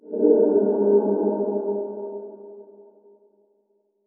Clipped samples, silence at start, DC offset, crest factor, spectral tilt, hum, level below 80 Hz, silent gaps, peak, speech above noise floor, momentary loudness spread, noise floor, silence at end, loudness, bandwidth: under 0.1%; 0.05 s; under 0.1%; 18 dB; -8 dB/octave; none; under -90 dBFS; none; -6 dBFS; 48 dB; 21 LU; -68 dBFS; 1.45 s; -21 LUFS; 1.7 kHz